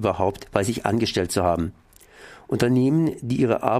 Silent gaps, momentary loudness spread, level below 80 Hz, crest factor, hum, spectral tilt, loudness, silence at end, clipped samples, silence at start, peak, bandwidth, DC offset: none; 6 LU; -48 dBFS; 20 dB; none; -6 dB/octave; -23 LUFS; 0 s; under 0.1%; 0 s; -4 dBFS; 15.5 kHz; under 0.1%